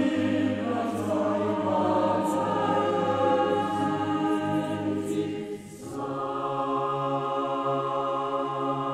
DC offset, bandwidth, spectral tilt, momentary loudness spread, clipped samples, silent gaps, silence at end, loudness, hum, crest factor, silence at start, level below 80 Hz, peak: under 0.1%; 13.5 kHz; -6.5 dB/octave; 6 LU; under 0.1%; none; 0 s; -27 LUFS; none; 14 dB; 0 s; -66 dBFS; -12 dBFS